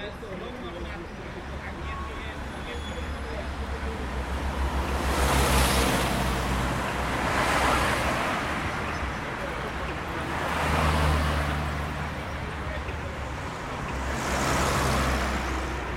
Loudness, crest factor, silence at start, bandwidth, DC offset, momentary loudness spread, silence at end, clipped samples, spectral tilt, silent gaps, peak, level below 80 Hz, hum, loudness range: -28 LUFS; 18 dB; 0 s; 16.5 kHz; under 0.1%; 12 LU; 0 s; under 0.1%; -4.5 dB/octave; none; -10 dBFS; -34 dBFS; none; 9 LU